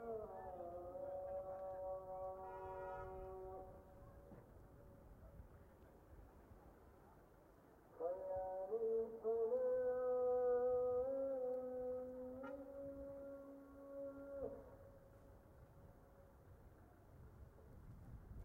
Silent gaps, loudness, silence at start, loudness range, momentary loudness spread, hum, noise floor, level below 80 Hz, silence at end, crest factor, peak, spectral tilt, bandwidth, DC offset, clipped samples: none; -45 LUFS; 0 s; 23 LU; 25 LU; none; -67 dBFS; -68 dBFS; 0 s; 14 dB; -32 dBFS; -8.5 dB/octave; 16 kHz; under 0.1%; under 0.1%